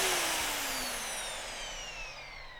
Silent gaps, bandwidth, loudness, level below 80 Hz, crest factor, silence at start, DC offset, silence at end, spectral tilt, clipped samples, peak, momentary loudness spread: none; over 20 kHz; -34 LUFS; -52 dBFS; 20 dB; 0 s; under 0.1%; 0 s; 0 dB/octave; under 0.1%; -16 dBFS; 12 LU